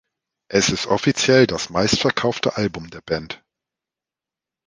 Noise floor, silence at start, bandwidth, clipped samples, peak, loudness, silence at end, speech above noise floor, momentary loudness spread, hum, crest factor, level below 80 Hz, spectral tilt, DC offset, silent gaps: -89 dBFS; 0.5 s; 10.5 kHz; under 0.1%; -2 dBFS; -19 LUFS; 1.3 s; 69 dB; 11 LU; none; 20 dB; -50 dBFS; -4 dB/octave; under 0.1%; none